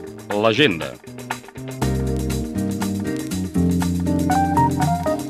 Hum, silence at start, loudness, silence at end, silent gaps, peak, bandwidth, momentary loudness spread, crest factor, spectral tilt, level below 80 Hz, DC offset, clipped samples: none; 0 s; -21 LUFS; 0 s; none; -4 dBFS; 15.5 kHz; 14 LU; 18 dB; -5.5 dB/octave; -36 dBFS; under 0.1%; under 0.1%